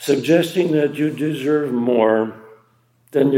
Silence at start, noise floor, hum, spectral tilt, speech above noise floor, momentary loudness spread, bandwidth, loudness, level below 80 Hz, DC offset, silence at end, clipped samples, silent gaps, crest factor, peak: 0 s; -58 dBFS; none; -6.5 dB/octave; 41 dB; 6 LU; 16.5 kHz; -18 LUFS; -72 dBFS; under 0.1%; 0 s; under 0.1%; none; 16 dB; -2 dBFS